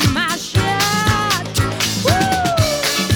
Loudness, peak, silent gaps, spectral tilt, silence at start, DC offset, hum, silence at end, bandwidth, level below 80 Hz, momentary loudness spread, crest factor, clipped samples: -16 LUFS; -2 dBFS; none; -3.5 dB/octave; 0 s; under 0.1%; none; 0 s; over 20 kHz; -36 dBFS; 3 LU; 16 dB; under 0.1%